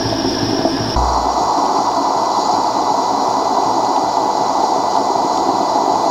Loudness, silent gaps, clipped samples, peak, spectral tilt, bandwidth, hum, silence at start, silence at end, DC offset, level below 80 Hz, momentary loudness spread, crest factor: -16 LUFS; none; under 0.1%; 0 dBFS; -4 dB/octave; 16.5 kHz; none; 0 s; 0 s; under 0.1%; -34 dBFS; 2 LU; 14 dB